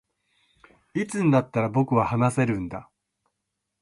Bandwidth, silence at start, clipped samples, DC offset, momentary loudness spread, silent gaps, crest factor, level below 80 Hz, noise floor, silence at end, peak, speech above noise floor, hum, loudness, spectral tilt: 11.5 kHz; 0.95 s; under 0.1%; under 0.1%; 12 LU; none; 18 dB; -56 dBFS; -81 dBFS; 1 s; -8 dBFS; 58 dB; none; -24 LUFS; -7.5 dB/octave